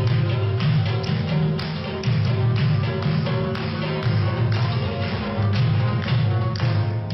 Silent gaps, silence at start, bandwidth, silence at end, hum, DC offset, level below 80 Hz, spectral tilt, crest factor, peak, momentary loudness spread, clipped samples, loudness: none; 0 s; 6 kHz; 0 s; none; under 0.1%; -44 dBFS; -8.5 dB/octave; 10 dB; -12 dBFS; 4 LU; under 0.1%; -22 LUFS